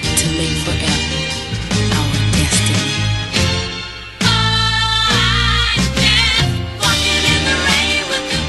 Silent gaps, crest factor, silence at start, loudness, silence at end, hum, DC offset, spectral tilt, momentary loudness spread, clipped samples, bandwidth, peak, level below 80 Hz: none; 16 dB; 0 s; -14 LUFS; 0 s; none; under 0.1%; -3 dB/octave; 7 LU; under 0.1%; 13 kHz; 0 dBFS; -26 dBFS